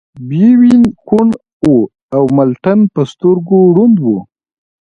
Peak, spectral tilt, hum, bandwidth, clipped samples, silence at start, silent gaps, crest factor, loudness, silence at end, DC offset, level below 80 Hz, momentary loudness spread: 0 dBFS; -9.5 dB/octave; none; 7.2 kHz; under 0.1%; 0.15 s; 1.53-1.60 s, 2.02-2.09 s; 10 dB; -10 LUFS; 0.75 s; under 0.1%; -48 dBFS; 8 LU